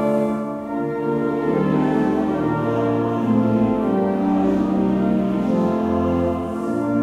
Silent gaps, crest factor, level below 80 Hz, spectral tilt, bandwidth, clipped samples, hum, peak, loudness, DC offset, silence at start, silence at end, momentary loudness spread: none; 12 dB; -46 dBFS; -9 dB/octave; 11 kHz; under 0.1%; none; -8 dBFS; -20 LUFS; under 0.1%; 0 s; 0 s; 5 LU